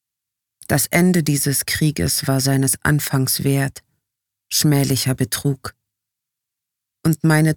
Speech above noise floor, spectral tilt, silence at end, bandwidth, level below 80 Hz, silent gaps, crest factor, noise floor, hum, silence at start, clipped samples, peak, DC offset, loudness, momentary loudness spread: 66 dB; -4.5 dB/octave; 0 s; 20 kHz; -48 dBFS; none; 18 dB; -83 dBFS; none; 0.7 s; under 0.1%; -2 dBFS; under 0.1%; -18 LUFS; 6 LU